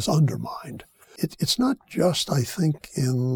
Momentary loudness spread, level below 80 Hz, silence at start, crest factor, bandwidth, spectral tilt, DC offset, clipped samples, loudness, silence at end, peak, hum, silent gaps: 13 LU; -56 dBFS; 0 s; 16 dB; 19 kHz; -5.5 dB/octave; under 0.1%; under 0.1%; -25 LUFS; 0 s; -8 dBFS; none; none